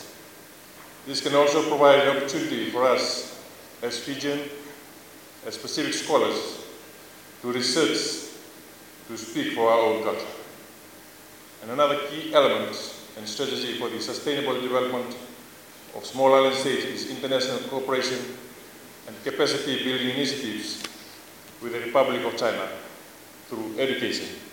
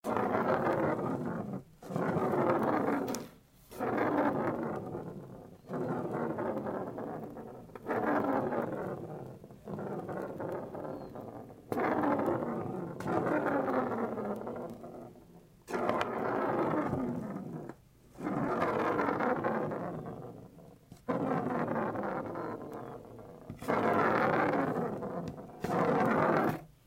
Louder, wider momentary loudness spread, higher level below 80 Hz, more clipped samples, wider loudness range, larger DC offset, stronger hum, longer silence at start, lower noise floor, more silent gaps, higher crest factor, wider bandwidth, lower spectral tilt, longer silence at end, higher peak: first, -25 LUFS vs -34 LUFS; first, 24 LU vs 17 LU; second, -72 dBFS vs -66 dBFS; neither; about the same, 6 LU vs 5 LU; neither; neither; about the same, 0 s vs 0.05 s; second, -47 dBFS vs -57 dBFS; neither; about the same, 22 dB vs 22 dB; about the same, 17 kHz vs 16 kHz; second, -3 dB/octave vs -7.5 dB/octave; second, 0 s vs 0.2 s; first, -4 dBFS vs -12 dBFS